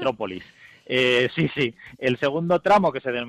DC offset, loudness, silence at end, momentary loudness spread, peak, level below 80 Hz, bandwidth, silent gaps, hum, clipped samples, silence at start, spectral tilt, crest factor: under 0.1%; -22 LUFS; 0 s; 10 LU; -10 dBFS; -60 dBFS; 11.5 kHz; none; none; under 0.1%; 0 s; -6 dB/octave; 14 dB